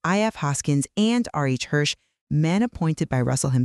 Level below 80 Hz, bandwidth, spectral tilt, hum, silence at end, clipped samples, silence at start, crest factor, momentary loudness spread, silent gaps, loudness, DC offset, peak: -52 dBFS; 12.5 kHz; -5.5 dB/octave; none; 0 s; under 0.1%; 0.05 s; 14 dB; 4 LU; 2.21-2.27 s; -23 LUFS; under 0.1%; -8 dBFS